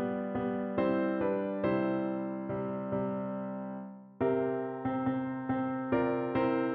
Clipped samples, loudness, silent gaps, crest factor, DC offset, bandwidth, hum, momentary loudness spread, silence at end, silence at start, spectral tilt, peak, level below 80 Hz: under 0.1%; -33 LUFS; none; 16 dB; under 0.1%; 4.5 kHz; none; 7 LU; 0 s; 0 s; -7 dB/octave; -16 dBFS; -64 dBFS